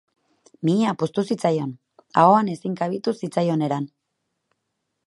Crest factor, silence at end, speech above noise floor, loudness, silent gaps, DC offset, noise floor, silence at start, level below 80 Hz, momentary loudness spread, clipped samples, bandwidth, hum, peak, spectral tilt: 22 dB; 1.2 s; 56 dB; -22 LUFS; none; under 0.1%; -77 dBFS; 0.6 s; -70 dBFS; 11 LU; under 0.1%; 11.5 kHz; none; -2 dBFS; -7 dB/octave